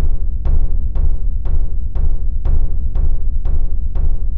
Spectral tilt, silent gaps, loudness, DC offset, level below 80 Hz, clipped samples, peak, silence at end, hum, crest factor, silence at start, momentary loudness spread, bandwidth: -11.5 dB/octave; none; -22 LUFS; 10%; -14 dBFS; under 0.1%; -4 dBFS; 0 s; none; 8 dB; 0 s; 2 LU; 1.4 kHz